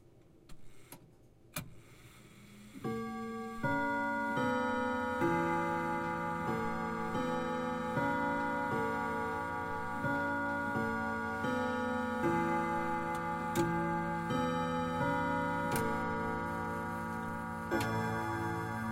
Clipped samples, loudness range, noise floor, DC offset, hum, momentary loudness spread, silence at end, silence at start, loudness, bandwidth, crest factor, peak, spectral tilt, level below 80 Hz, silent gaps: under 0.1%; 3 LU; -60 dBFS; under 0.1%; none; 7 LU; 0 s; 0.15 s; -35 LUFS; 16 kHz; 16 dB; -18 dBFS; -6 dB/octave; -58 dBFS; none